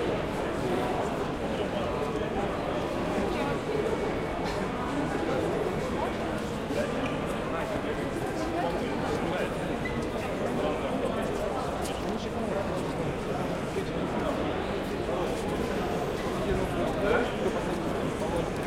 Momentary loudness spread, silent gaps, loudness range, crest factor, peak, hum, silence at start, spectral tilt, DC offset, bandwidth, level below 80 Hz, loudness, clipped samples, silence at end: 3 LU; none; 1 LU; 18 dB; -12 dBFS; none; 0 s; -6 dB/octave; under 0.1%; 16.5 kHz; -44 dBFS; -30 LUFS; under 0.1%; 0 s